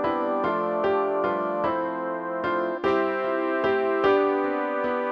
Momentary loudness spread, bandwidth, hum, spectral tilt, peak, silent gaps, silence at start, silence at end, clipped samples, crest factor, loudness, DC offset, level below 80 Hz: 5 LU; 6.2 kHz; none; -7 dB/octave; -10 dBFS; none; 0 s; 0 s; under 0.1%; 14 dB; -25 LUFS; under 0.1%; -60 dBFS